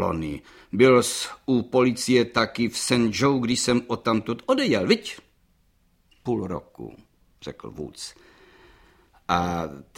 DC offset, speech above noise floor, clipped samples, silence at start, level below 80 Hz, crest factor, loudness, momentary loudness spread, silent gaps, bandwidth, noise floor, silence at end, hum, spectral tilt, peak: under 0.1%; 40 dB; under 0.1%; 0 s; -54 dBFS; 20 dB; -23 LUFS; 18 LU; none; 16.5 kHz; -64 dBFS; 0.15 s; none; -4.5 dB/octave; -4 dBFS